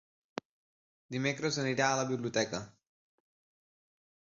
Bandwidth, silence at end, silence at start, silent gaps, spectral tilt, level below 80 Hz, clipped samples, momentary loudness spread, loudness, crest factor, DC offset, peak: 7.6 kHz; 1.55 s; 1.1 s; none; -3.5 dB/octave; -72 dBFS; under 0.1%; 16 LU; -33 LUFS; 22 dB; under 0.1%; -14 dBFS